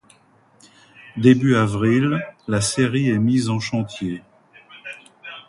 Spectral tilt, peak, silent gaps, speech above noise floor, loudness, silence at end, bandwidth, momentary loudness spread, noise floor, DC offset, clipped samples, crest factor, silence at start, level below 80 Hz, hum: -6 dB/octave; 0 dBFS; none; 37 dB; -19 LUFS; 0.1 s; 11.5 kHz; 20 LU; -55 dBFS; under 0.1%; under 0.1%; 20 dB; 1.05 s; -52 dBFS; none